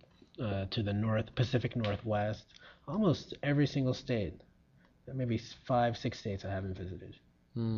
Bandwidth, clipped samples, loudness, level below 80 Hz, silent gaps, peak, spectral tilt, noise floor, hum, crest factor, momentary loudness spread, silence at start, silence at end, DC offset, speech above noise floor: 7.2 kHz; under 0.1%; -35 LUFS; -58 dBFS; none; -18 dBFS; -6 dB/octave; -65 dBFS; none; 18 dB; 14 LU; 0.4 s; 0 s; under 0.1%; 32 dB